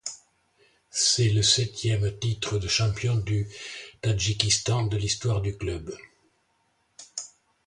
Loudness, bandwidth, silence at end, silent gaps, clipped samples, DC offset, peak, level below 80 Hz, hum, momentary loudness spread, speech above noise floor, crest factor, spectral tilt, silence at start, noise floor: -25 LUFS; 11.5 kHz; 0.4 s; none; under 0.1%; under 0.1%; -6 dBFS; -46 dBFS; none; 17 LU; 45 dB; 22 dB; -3.5 dB/octave; 0.05 s; -70 dBFS